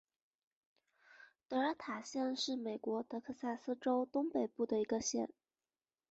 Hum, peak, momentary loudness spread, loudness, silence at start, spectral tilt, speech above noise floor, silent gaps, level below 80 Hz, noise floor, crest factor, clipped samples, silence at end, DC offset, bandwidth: none; -24 dBFS; 7 LU; -39 LUFS; 1.1 s; -3 dB/octave; over 51 dB; none; -80 dBFS; under -90 dBFS; 16 dB; under 0.1%; 0.85 s; under 0.1%; 8 kHz